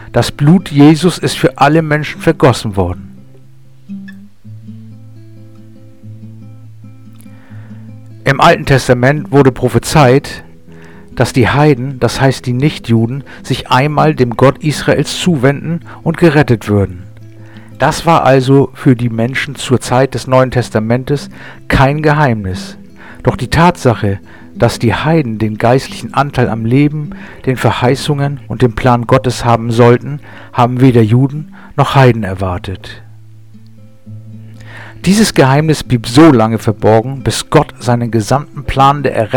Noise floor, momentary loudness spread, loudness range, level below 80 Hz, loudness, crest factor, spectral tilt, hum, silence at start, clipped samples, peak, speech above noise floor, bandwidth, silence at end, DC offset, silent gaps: -42 dBFS; 17 LU; 5 LU; -34 dBFS; -11 LUFS; 12 dB; -6.5 dB/octave; none; 0 s; 0.4%; 0 dBFS; 31 dB; 17.5 kHz; 0 s; 1%; none